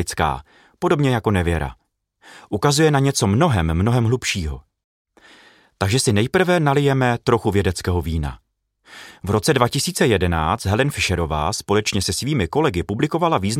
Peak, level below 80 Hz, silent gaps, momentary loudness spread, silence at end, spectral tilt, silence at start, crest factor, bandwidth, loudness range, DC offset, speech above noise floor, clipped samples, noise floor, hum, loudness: -2 dBFS; -36 dBFS; 4.84-5.05 s; 9 LU; 0 s; -5 dB/octave; 0 s; 18 dB; 16 kHz; 2 LU; under 0.1%; 31 dB; under 0.1%; -50 dBFS; none; -19 LUFS